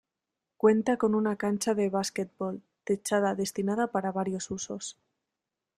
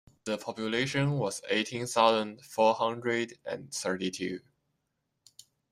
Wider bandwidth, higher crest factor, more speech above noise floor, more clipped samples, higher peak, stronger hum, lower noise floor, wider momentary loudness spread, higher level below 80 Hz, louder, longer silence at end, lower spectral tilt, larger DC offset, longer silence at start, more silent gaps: about the same, 14.5 kHz vs 15.5 kHz; about the same, 20 dB vs 24 dB; first, 59 dB vs 51 dB; neither; about the same, -10 dBFS vs -8 dBFS; neither; first, -87 dBFS vs -81 dBFS; about the same, 11 LU vs 11 LU; about the same, -70 dBFS vs -70 dBFS; about the same, -29 LUFS vs -30 LUFS; second, 0.85 s vs 1.3 s; about the same, -5 dB/octave vs -4.5 dB/octave; neither; first, 0.65 s vs 0.25 s; neither